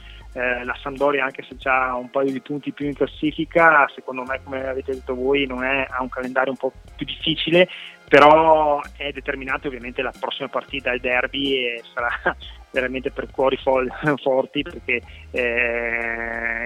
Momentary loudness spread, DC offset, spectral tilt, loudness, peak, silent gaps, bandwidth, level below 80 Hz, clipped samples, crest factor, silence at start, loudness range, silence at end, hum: 12 LU; under 0.1%; -6 dB/octave; -21 LUFS; 0 dBFS; none; 12 kHz; -44 dBFS; under 0.1%; 22 dB; 0 s; 6 LU; 0 s; none